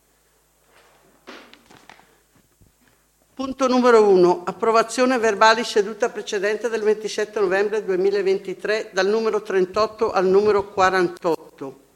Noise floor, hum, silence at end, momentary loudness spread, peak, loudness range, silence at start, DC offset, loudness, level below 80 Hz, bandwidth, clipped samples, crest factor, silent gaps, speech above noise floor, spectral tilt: -61 dBFS; none; 0.2 s; 10 LU; -2 dBFS; 4 LU; 1.3 s; under 0.1%; -20 LUFS; -60 dBFS; 13 kHz; under 0.1%; 20 dB; none; 42 dB; -4.5 dB/octave